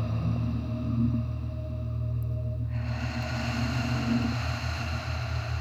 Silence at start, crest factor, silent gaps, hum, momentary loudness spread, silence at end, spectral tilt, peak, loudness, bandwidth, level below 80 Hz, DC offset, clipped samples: 0 s; 14 dB; none; none; 5 LU; 0 s; -6.5 dB/octave; -16 dBFS; -30 LUFS; 8.2 kHz; -38 dBFS; 0.1%; under 0.1%